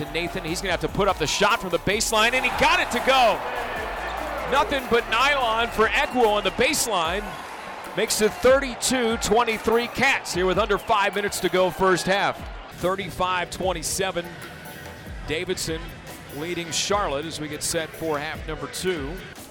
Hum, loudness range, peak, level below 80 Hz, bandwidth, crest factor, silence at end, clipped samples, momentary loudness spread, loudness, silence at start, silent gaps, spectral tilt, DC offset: none; 7 LU; -10 dBFS; -42 dBFS; 19.5 kHz; 12 dB; 0 s; under 0.1%; 14 LU; -23 LUFS; 0 s; none; -3 dB/octave; under 0.1%